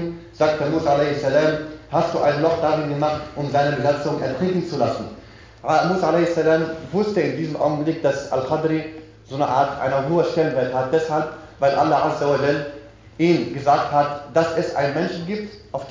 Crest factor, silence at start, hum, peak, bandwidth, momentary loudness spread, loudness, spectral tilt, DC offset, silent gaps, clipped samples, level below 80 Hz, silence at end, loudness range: 16 dB; 0 s; none; -4 dBFS; 7.6 kHz; 9 LU; -21 LUFS; -6.5 dB/octave; under 0.1%; none; under 0.1%; -50 dBFS; 0 s; 2 LU